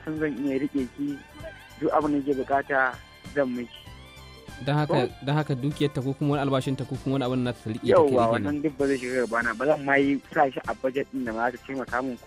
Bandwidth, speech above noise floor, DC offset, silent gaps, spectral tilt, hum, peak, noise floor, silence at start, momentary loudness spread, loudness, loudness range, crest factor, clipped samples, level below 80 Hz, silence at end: 14.5 kHz; 21 dB; under 0.1%; none; -7 dB/octave; none; -8 dBFS; -46 dBFS; 0 s; 14 LU; -26 LUFS; 4 LU; 18 dB; under 0.1%; -54 dBFS; 0 s